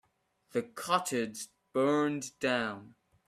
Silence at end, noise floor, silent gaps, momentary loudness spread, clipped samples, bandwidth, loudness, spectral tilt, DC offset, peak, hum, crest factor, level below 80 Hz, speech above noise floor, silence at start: 0.4 s; -73 dBFS; none; 10 LU; under 0.1%; 15.5 kHz; -32 LUFS; -4 dB/octave; under 0.1%; -14 dBFS; none; 20 dB; -74 dBFS; 41 dB; 0.55 s